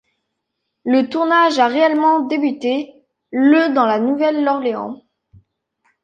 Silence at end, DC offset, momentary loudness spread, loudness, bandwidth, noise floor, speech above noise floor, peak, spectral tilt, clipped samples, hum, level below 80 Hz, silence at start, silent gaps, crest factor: 1.1 s; under 0.1%; 13 LU; -16 LUFS; 8.8 kHz; -76 dBFS; 60 dB; -2 dBFS; -5 dB/octave; under 0.1%; none; -66 dBFS; 0.85 s; none; 16 dB